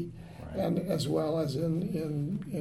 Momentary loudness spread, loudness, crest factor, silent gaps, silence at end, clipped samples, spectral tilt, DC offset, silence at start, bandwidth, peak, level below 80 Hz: 9 LU; -32 LUFS; 14 dB; none; 0 s; under 0.1%; -7.5 dB/octave; under 0.1%; 0 s; 15.5 kHz; -18 dBFS; -56 dBFS